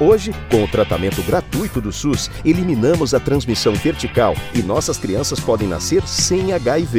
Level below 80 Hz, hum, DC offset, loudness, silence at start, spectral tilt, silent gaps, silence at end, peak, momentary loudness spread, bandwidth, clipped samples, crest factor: -34 dBFS; none; under 0.1%; -18 LUFS; 0 s; -5 dB/octave; none; 0 s; -2 dBFS; 4 LU; 16.5 kHz; under 0.1%; 14 dB